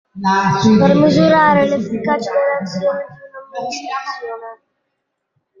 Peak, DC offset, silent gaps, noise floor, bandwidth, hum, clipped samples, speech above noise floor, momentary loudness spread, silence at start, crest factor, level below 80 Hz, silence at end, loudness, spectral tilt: -2 dBFS; under 0.1%; none; -73 dBFS; 7.6 kHz; none; under 0.1%; 59 dB; 17 LU; 0.15 s; 14 dB; -52 dBFS; 1.05 s; -15 LUFS; -6.5 dB/octave